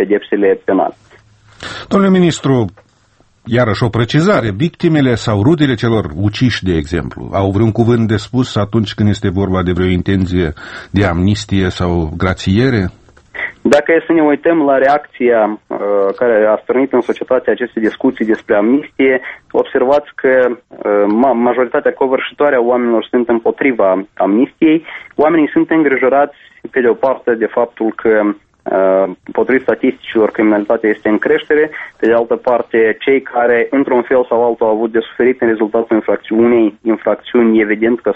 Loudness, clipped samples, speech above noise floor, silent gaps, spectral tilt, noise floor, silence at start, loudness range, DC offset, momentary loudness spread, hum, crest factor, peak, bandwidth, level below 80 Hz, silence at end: -13 LUFS; under 0.1%; 40 dB; none; -7 dB/octave; -52 dBFS; 0 s; 2 LU; under 0.1%; 6 LU; none; 12 dB; 0 dBFS; 8.6 kHz; -40 dBFS; 0 s